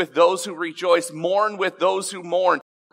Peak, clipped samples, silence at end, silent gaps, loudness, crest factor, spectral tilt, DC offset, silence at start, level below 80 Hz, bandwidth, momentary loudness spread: -4 dBFS; under 0.1%; 0.3 s; none; -21 LUFS; 18 dB; -3 dB/octave; under 0.1%; 0 s; -84 dBFS; 16 kHz; 7 LU